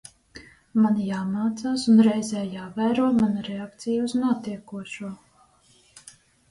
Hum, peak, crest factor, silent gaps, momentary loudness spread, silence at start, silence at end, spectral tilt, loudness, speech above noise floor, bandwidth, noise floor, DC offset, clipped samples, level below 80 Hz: none; -8 dBFS; 18 dB; none; 17 LU; 0.35 s; 1.35 s; -6 dB/octave; -24 LUFS; 36 dB; 11.5 kHz; -59 dBFS; under 0.1%; under 0.1%; -62 dBFS